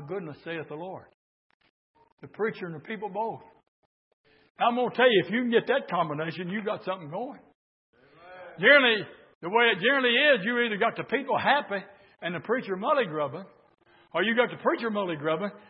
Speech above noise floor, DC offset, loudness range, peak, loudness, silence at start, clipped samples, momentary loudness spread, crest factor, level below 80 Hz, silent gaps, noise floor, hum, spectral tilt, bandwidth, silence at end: 23 dB; under 0.1%; 14 LU; -6 dBFS; -26 LUFS; 0 s; under 0.1%; 16 LU; 22 dB; -80 dBFS; 1.14-1.60 s, 1.70-1.94 s, 2.12-2.18 s, 3.68-4.24 s, 4.50-4.55 s, 7.55-7.93 s, 9.35-9.41 s; -49 dBFS; none; -8.5 dB/octave; 5.6 kHz; 0.1 s